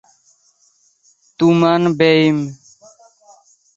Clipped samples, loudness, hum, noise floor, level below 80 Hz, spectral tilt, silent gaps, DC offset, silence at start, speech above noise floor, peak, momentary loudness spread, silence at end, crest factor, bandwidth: under 0.1%; -14 LUFS; none; -58 dBFS; -60 dBFS; -6.5 dB/octave; none; under 0.1%; 1.4 s; 45 dB; -2 dBFS; 8 LU; 1.2 s; 16 dB; 7.8 kHz